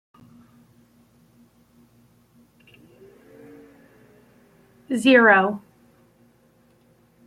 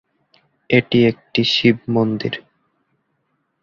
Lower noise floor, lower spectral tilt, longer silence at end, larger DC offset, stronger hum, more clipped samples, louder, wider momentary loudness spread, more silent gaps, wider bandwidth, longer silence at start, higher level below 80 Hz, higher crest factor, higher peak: second, -59 dBFS vs -69 dBFS; second, -5 dB/octave vs -6.5 dB/octave; first, 1.7 s vs 1.2 s; neither; neither; neither; about the same, -17 LUFS vs -17 LUFS; first, 17 LU vs 10 LU; neither; first, 13 kHz vs 7.2 kHz; first, 4.9 s vs 0.7 s; second, -70 dBFS vs -56 dBFS; about the same, 22 dB vs 18 dB; about the same, -4 dBFS vs -2 dBFS